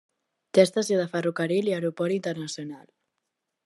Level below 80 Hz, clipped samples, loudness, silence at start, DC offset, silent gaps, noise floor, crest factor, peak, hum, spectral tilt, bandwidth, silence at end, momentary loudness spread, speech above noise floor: -78 dBFS; under 0.1%; -25 LUFS; 0.55 s; under 0.1%; none; -82 dBFS; 22 dB; -4 dBFS; none; -5.5 dB/octave; 12.5 kHz; 0.85 s; 14 LU; 56 dB